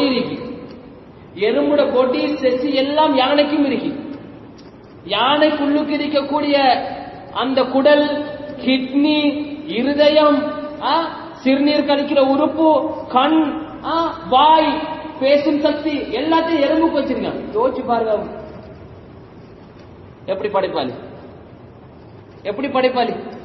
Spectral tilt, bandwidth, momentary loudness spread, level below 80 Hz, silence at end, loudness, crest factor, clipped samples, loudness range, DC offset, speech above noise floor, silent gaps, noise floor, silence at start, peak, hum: -7 dB/octave; 6 kHz; 15 LU; -50 dBFS; 0 s; -17 LUFS; 18 dB; under 0.1%; 8 LU; under 0.1%; 24 dB; none; -40 dBFS; 0 s; 0 dBFS; none